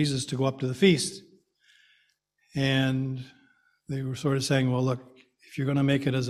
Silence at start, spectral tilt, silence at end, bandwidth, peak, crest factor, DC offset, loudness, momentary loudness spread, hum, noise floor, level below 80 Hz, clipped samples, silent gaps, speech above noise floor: 0 s; -5.5 dB/octave; 0 s; 14 kHz; -8 dBFS; 20 dB; under 0.1%; -27 LUFS; 14 LU; none; -71 dBFS; -60 dBFS; under 0.1%; none; 45 dB